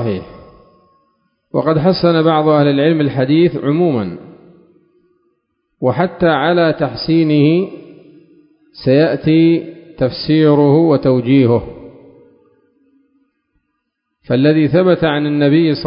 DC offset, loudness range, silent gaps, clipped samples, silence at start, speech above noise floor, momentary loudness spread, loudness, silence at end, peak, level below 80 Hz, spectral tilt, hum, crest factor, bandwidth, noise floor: under 0.1%; 5 LU; none; under 0.1%; 0 s; 59 dB; 9 LU; -13 LUFS; 0 s; 0 dBFS; -48 dBFS; -12 dB/octave; none; 14 dB; 5.4 kHz; -72 dBFS